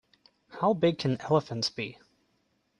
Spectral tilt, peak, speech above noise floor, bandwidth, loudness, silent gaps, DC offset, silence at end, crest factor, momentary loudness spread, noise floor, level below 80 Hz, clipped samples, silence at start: -6 dB/octave; -12 dBFS; 45 dB; 11.5 kHz; -29 LUFS; none; under 0.1%; 0.85 s; 20 dB; 13 LU; -73 dBFS; -68 dBFS; under 0.1%; 0.5 s